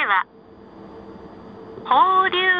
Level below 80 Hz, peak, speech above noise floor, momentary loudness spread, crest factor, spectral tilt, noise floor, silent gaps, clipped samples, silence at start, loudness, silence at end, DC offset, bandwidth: -58 dBFS; -4 dBFS; 25 dB; 25 LU; 16 dB; -5.5 dB/octave; -43 dBFS; none; under 0.1%; 0 s; -17 LUFS; 0 s; under 0.1%; 5.2 kHz